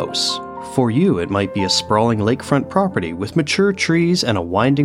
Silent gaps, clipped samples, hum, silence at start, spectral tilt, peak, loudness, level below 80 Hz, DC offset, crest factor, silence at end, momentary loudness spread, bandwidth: none; under 0.1%; none; 0 s; -5 dB/octave; -2 dBFS; -18 LUFS; -48 dBFS; under 0.1%; 16 dB; 0 s; 5 LU; 15 kHz